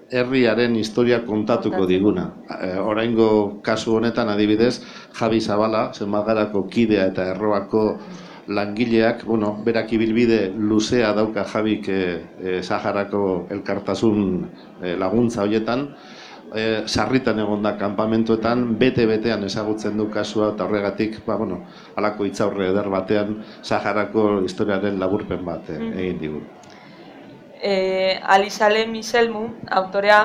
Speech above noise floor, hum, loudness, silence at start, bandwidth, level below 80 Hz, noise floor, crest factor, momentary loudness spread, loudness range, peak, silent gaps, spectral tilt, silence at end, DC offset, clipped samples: 22 dB; none; -21 LUFS; 0.1 s; 11 kHz; -50 dBFS; -42 dBFS; 20 dB; 10 LU; 3 LU; -2 dBFS; none; -6 dB/octave; 0 s; under 0.1%; under 0.1%